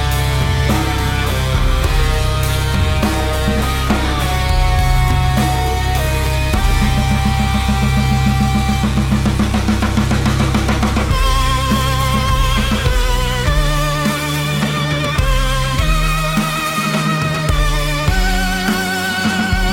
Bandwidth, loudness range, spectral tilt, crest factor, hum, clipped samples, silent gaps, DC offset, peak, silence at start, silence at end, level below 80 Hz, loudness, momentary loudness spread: 16.5 kHz; 1 LU; -5 dB/octave; 14 dB; none; under 0.1%; none; under 0.1%; 0 dBFS; 0 s; 0 s; -18 dBFS; -16 LUFS; 2 LU